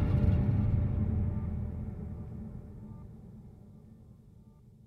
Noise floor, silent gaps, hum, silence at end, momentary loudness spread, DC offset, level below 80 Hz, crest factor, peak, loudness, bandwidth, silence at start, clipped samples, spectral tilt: -56 dBFS; none; none; 0.15 s; 25 LU; under 0.1%; -40 dBFS; 16 dB; -16 dBFS; -32 LUFS; 4.4 kHz; 0 s; under 0.1%; -11 dB/octave